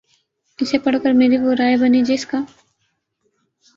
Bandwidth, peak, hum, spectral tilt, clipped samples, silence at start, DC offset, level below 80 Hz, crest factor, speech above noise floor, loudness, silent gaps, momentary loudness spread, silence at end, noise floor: 7.6 kHz; -4 dBFS; none; -4.5 dB/octave; under 0.1%; 0.6 s; under 0.1%; -60 dBFS; 16 dB; 54 dB; -17 LUFS; none; 11 LU; 1.3 s; -70 dBFS